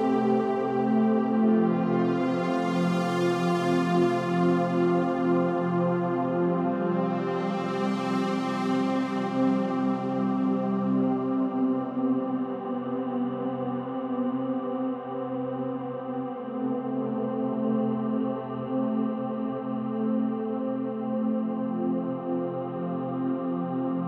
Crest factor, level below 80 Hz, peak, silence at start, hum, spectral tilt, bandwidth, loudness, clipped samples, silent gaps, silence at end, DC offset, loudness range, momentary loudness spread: 14 dB; -74 dBFS; -12 dBFS; 0 s; none; -8 dB/octave; 9.6 kHz; -27 LUFS; under 0.1%; none; 0 s; under 0.1%; 6 LU; 7 LU